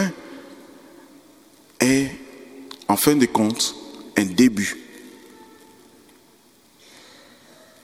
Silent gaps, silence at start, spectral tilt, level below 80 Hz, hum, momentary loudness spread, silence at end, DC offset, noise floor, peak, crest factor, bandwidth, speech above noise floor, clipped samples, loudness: none; 0 s; -4 dB/octave; -58 dBFS; none; 25 LU; 2.75 s; under 0.1%; -55 dBFS; 0 dBFS; 24 dB; 17.5 kHz; 36 dB; under 0.1%; -20 LUFS